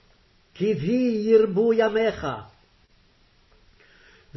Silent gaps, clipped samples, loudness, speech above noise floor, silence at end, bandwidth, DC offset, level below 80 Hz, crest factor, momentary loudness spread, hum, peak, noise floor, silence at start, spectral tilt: none; under 0.1%; -22 LUFS; 38 dB; 1.9 s; 6 kHz; under 0.1%; -56 dBFS; 18 dB; 13 LU; none; -8 dBFS; -60 dBFS; 0.55 s; -7.5 dB/octave